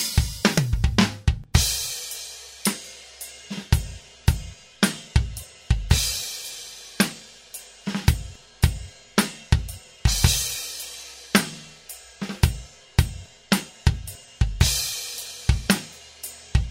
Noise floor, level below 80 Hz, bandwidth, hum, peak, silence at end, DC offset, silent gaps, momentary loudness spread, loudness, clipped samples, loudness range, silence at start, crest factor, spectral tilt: -44 dBFS; -30 dBFS; 16 kHz; none; 0 dBFS; 0 s; under 0.1%; none; 17 LU; -24 LUFS; under 0.1%; 3 LU; 0 s; 24 dB; -4 dB/octave